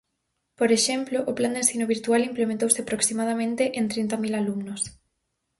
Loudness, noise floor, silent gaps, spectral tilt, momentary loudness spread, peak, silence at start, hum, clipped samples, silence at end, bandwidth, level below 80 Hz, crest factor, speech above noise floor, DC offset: -24 LUFS; -78 dBFS; none; -3 dB/octave; 7 LU; -4 dBFS; 0.6 s; none; under 0.1%; 0.7 s; 12 kHz; -64 dBFS; 22 dB; 53 dB; under 0.1%